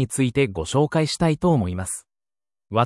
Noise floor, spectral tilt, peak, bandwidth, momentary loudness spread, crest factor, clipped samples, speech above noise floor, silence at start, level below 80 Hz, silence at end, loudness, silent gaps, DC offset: under -90 dBFS; -5.5 dB/octave; -4 dBFS; 12 kHz; 8 LU; 18 dB; under 0.1%; over 69 dB; 0 s; -48 dBFS; 0 s; -22 LUFS; none; under 0.1%